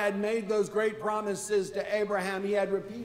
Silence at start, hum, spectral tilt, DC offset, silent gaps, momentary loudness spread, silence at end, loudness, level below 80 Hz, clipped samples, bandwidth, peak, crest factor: 0 s; none; -4.5 dB/octave; under 0.1%; none; 3 LU; 0 s; -30 LUFS; -66 dBFS; under 0.1%; 15.5 kHz; -16 dBFS; 14 dB